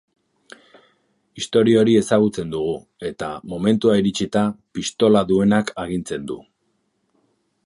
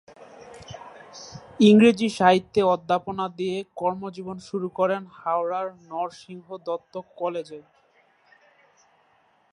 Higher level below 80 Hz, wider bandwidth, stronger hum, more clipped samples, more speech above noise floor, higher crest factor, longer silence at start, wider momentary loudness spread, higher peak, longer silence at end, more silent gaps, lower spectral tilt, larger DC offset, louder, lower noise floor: first, -52 dBFS vs -64 dBFS; about the same, 11.5 kHz vs 11 kHz; neither; neither; first, 50 dB vs 40 dB; about the same, 18 dB vs 22 dB; first, 1.35 s vs 0.2 s; second, 13 LU vs 24 LU; about the same, -2 dBFS vs -2 dBFS; second, 1.25 s vs 1.9 s; neither; about the same, -6 dB/octave vs -6 dB/octave; neither; first, -19 LUFS vs -23 LUFS; first, -69 dBFS vs -63 dBFS